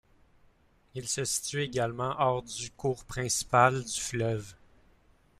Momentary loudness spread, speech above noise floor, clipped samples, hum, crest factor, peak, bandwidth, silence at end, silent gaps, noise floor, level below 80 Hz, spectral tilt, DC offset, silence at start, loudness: 14 LU; 34 dB; under 0.1%; none; 22 dB; -8 dBFS; 15.5 kHz; 0.85 s; none; -64 dBFS; -58 dBFS; -3.5 dB/octave; under 0.1%; 0.95 s; -30 LUFS